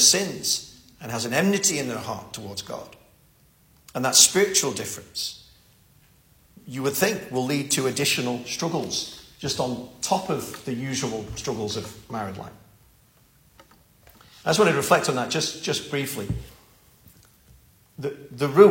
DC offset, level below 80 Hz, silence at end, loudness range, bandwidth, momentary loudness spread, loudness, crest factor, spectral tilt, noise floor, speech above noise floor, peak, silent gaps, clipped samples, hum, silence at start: under 0.1%; -54 dBFS; 0 s; 9 LU; 16.5 kHz; 16 LU; -24 LUFS; 26 dB; -2.5 dB/octave; -58 dBFS; 35 dB; 0 dBFS; none; under 0.1%; none; 0 s